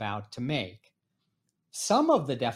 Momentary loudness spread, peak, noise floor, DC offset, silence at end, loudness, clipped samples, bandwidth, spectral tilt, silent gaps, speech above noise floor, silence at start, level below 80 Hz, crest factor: 15 LU; -12 dBFS; -79 dBFS; under 0.1%; 0 s; -28 LUFS; under 0.1%; 16 kHz; -4.5 dB/octave; none; 51 dB; 0 s; -70 dBFS; 18 dB